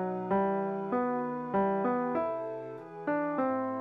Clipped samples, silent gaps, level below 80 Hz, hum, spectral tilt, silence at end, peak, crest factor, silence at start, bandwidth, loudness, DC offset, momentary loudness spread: under 0.1%; none; -68 dBFS; none; -10 dB/octave; 0 s; -18 dBFS; 14 dB; 0 s; 5.6 kHz; -32 LUFS; under 0.1%; 9 LU